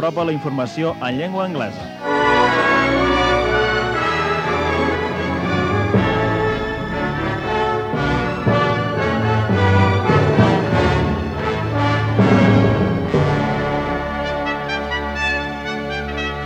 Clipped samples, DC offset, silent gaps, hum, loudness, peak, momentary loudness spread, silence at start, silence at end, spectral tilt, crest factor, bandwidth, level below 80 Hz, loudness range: under 0.1%; under 0.1%; none; none; -18 LUFS; -2 dBFS; 8 LU; 0 s; 0 s; -7 dB/octave; 16 dB; 9.2 kHz; -34 dBFS; 3 LU